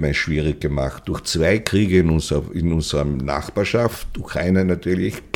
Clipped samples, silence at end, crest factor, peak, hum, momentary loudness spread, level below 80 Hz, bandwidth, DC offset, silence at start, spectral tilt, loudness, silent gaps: under 0.1%; 0.15 s; 20 dB; 0 dBFS; none; 7 LU; -32 dBFS; 18 kHz; under 0.1%; 0 s; -6 dB/octave; -20 LUFS; none